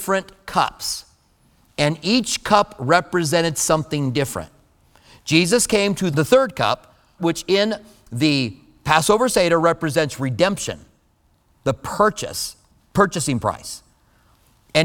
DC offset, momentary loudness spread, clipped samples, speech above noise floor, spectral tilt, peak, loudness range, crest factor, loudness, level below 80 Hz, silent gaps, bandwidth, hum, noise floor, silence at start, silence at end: under 0.1%; 13 LU; under 0.1%; 42 dB; -4 dB/octave; 0 dBFS; 4 LU; 20 dB; -20 LUFS; -48 dBFS; none; 19 kHz; none; -61 dBFS; 0 s; 0 s